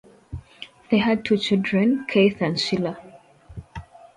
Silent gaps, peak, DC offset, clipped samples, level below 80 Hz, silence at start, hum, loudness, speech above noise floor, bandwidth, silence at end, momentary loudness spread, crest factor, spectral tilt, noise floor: none; -6 dBFS; under 0.1%; under 0.1%; -50 dBFS; 0.3 s; none; -21 LUFS; 27 dB; 11 kHz; 0.35 s; 22 LU; 18 dB; -6 dB/octave; -48 dBFS